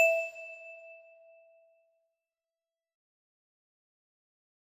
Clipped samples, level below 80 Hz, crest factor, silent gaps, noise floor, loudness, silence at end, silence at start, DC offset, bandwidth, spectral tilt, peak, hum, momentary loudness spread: under 0.1%; under -90 dBFS; 26 dB; none; under -90 dBFS; -33 LUFS; 3.7 s; 0 s; under 0.1%; 14.5 kHz; 1.5 dB/octave; -14 dBFS; none; 23 LU